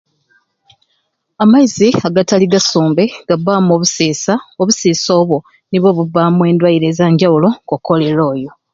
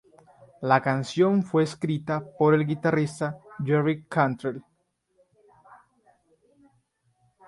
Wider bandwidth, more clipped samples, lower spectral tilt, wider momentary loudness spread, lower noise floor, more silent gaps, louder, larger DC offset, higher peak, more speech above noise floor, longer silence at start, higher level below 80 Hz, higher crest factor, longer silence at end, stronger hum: second, 7.8 kHz vs 11.5 kHz; neither; second, -5.5 dB/octave vs -7 dB/octave; second, 6 LU vs 11 LU; second, -65 dBFS vs -69 dBFS; neither; first, -12 LUFS vs -25 LUFS; neither; first, 0 dBFS vs -4 dBFS; first, 53 dB vs 45 dB; first, 1.4 s vs 0.6 s; first, -54 dBFS vs -66 dBFS; second, 12 dB vs 22 dB; second, 0.25 s vs 2.85 s; neither